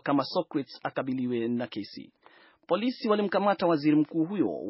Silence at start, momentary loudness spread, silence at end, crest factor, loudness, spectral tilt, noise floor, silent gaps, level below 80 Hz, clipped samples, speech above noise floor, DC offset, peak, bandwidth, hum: 0.05 s; 10 LU; 0 s; 18 dB; -28 LUFS; -5 dB/octave; -58 dBFS; none; -76 dBFS; under 0.1%; 31 dB; under 0.1%; -12 dBFS; 5.8 kHz; none